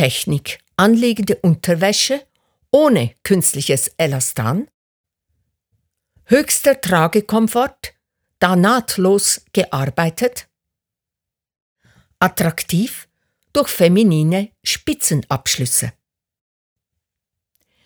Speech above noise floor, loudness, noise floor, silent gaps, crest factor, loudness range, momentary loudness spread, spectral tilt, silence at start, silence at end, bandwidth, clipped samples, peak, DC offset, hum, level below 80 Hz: 70 dB; -16 LUFS; -86 dBFS; 4.74-5.04 s, 11.62-11.76 s; 18 dB; 6 LU; 8 LU; -4.5 dB/octave; 0 s; 1.95 s; over 20 kHz; under 0.1%; 0 dBFS; under 0.1%; none; -52 dBFS